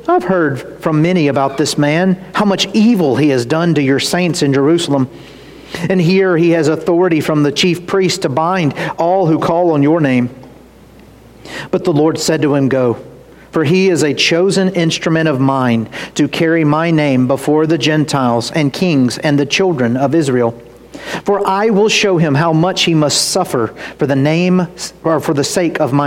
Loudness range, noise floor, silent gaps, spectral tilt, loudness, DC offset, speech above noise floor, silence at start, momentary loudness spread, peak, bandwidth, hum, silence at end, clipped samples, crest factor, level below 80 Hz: 2 LU; -40 dBFS; none; -5.5 dB/octave; -13 LUFS; under 0.1%; 27 dB; 0.05 s; 6 LU; -2 dBFS; 16.5 kHz; none; 0 s; under 0.1%; 12 dB; -50 dBFS